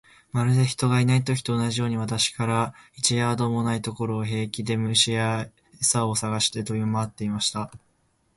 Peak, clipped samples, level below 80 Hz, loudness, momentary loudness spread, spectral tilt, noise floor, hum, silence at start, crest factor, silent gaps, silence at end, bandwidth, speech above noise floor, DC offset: -6 dBFS; under 0.1%; -56 dBFS; -24 LUFS; 8 LU; -4 dB/octave; -67 dBFS; none; 0.35 s; 18 dB; none; 0.6 s; 11.5 kHz; 43 dB; under 0.1%